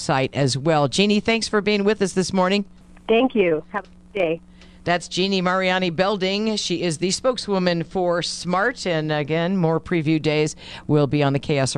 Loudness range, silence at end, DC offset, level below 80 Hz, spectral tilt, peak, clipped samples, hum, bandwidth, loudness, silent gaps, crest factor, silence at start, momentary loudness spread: 2 LU; 0 s; under 0.1%; -50 dBFS; -5 dB/octave; -2 dBFS; under 0.1%; none; 11.5 kHz; -21 LUFS; none; 20 dB; 0 s; 6 LU